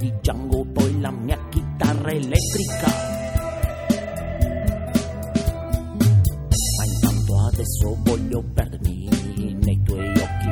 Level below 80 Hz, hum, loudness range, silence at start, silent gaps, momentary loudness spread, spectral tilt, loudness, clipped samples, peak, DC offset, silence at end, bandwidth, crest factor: -28 dBFS; none; 3 LU; 0 s; none; 6 LU; -6 dB/octave; -22 LUFS; under 0.1%; -2 dBFS; under 0.1%; 0 s; over 20 kHz; 18 dB